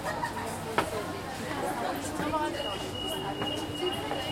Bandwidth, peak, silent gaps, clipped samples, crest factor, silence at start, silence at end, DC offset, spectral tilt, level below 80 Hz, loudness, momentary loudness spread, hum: 16.5 kHz; -10 dBFS; none; under 0.1%; 22 dB; 0 s; 0 s; under 0.1%; -4 dB/octave; -54 dBFS; -32 LUFS; 4 LU; none